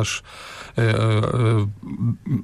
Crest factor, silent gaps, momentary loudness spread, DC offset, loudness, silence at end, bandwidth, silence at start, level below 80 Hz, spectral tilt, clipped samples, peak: 12 dB; none; 10 LU; under 0.1%; -22 LUFS; 0 s; 12 kHz; 0 s; -46 dBFS; -6 dB/octave; under 0.1%; -10 dBFS